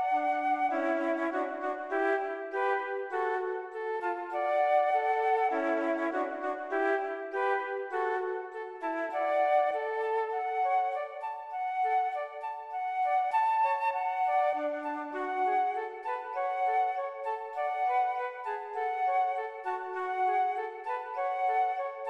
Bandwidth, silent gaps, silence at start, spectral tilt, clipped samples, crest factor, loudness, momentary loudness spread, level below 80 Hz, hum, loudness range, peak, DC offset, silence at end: 8.2 kHz; none; 0 s; -3.5 dB/octave; under 0.1%; 14 dB; -31 LUFS; 8 LU; -86 dBFS; none; 3 LU; -16 dBFS; under 0.1%; 0 s